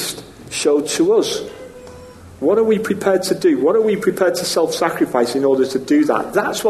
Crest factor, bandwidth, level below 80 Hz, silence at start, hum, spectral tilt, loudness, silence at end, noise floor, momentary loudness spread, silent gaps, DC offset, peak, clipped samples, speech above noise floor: 16 dB; 13 kHz; -54 dBFS; 0 s; none; -4 dB/octave; -17 LUFS; 0 s; -38 dBFS; 11 LU; none; under 0.1%; -2 dBFS; under 0.1%; 22 dB